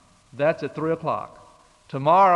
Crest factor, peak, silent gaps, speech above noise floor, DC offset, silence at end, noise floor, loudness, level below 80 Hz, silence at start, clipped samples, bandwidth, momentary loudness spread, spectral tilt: 16 dB; -6 dBFS; none; 32 dB; under 0.1%; 0 s; -52 dBFS; -24 LUFS; -64 dBFS; 0.35 s; under 0.1%; 10.5 kHz; 14 LU; -7.5 dB/octave